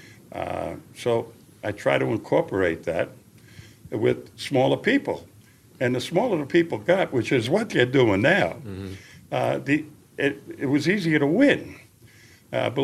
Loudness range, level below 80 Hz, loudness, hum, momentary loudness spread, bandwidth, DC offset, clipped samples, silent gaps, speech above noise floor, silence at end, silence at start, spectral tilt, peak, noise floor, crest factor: 4 LU; -60 dBFS; -24 LUFS; none; 15 LU; 14 kHz; under 0.1%; under 0.1%; none; 29 dB; 0 s; 0.05 s; -6 dB/octave; -4 dBFS; -51 dBFS; 20 dB